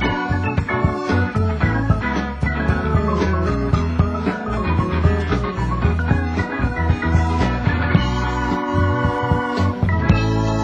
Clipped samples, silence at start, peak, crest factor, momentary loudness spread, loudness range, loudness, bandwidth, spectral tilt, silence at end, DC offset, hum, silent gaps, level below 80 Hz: under 0.1%; 0 s; 0 dBFS; 18 dB; 3 LU; 1 LU; -19 LUFS; 8.4 kHz; -7.5 dB/octave; 0 s; under 0.1%; none; none; -24 dBFS